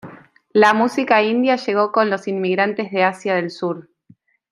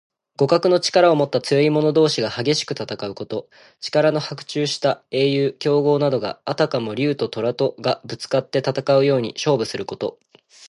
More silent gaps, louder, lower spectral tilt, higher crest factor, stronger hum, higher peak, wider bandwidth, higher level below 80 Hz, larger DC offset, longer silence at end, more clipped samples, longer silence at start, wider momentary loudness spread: neither; about the same, -18 LUFS vs -20 LUFS; about the same, -5.5 dB/octave vs -5.5 dB/octave; about the same, 16 dB vs 18 dB; neither; about the same, -2 dBFS vs -2 dBFS; about the same, 11.5 kHz vs 11.5 kHz; second, -70 dBFS vs -64 dBFS; neither; first, 0.7 s vs 0 s; neither; second, 0.05 s vs 0.4 s; about the same, 9 LU vs 11 LU